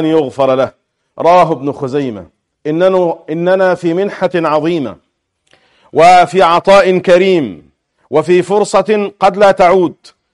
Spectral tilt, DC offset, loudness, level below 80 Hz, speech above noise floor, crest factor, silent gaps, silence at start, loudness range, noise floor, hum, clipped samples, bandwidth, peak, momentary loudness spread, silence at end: -6 dB/octave; under 0.1%; -11 LUFS; -48 dBFS; 45 dB; 12 dB; none; 0 s; 4 LU; -55 dBFS; none; under 0.1%; 11.5 kHz; 0 dBFS; 11 LU; 0.4 s